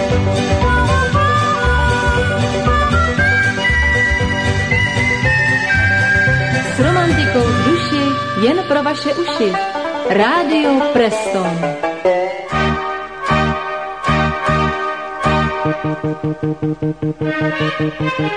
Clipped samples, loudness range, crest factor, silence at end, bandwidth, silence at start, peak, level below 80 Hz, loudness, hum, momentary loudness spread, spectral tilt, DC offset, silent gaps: under 0.1%; 4 LU; 14 dB; 0 s; 10 kHz; 0 s; 0 dBFS; -28 dBFS; -15 LUFS; none; 7 LU; -5.5 dB/octave; 0.4%; none